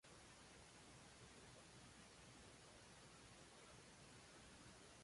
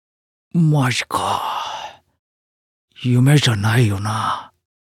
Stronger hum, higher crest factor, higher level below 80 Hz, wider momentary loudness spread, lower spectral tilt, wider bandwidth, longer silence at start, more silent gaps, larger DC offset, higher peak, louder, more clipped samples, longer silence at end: neither; about the same, 14 dB vs 16 dB; second, -76 dBFS vs -58 dBFS; second, 0 LU vs 14 LU; second, -3 dB/octave vs -5.5 dB/octave; second, 11.5 kHz vs 16 kHz; second, 0.05 s vs 0.55 s; second, none vs 2.19-2.88 s; neither; second, -52 dBFS vs -2 dBFS; second, -63 LUFS vs -18 LUFS; neither; second, 0 s vs 0.45 s